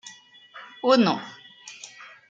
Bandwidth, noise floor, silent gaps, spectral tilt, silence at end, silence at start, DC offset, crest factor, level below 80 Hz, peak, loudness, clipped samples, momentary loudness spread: 7.8 kHz; -48 dBFS; none; -5 dB/octave; 0.25 s; 0.05 s; under 0.1%; 20 dB; -76 dBFS; -6 dBFS; -22 LUFS; under 0.1%; 24 LU